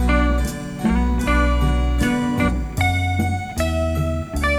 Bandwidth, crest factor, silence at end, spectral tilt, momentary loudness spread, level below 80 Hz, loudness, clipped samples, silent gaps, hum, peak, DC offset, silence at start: 15 kHz; 14 dB; 0 s; -6 dB/octave; 5 LU; -22 dBFS; -20 LUFS; under 0.1%; none; none; -4 dBFS; under 0.1%; 0 s